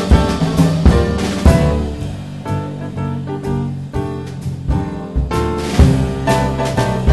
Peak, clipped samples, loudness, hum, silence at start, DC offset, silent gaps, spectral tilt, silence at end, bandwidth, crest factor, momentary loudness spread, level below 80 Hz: 0 dBFS; under 0.1%; -17 LUFS; none; 0 s; under 0.1%; none; -7 dB/octave; 0 s; 12.5 kHz; 16 dB; 12 LU; -20 dBFS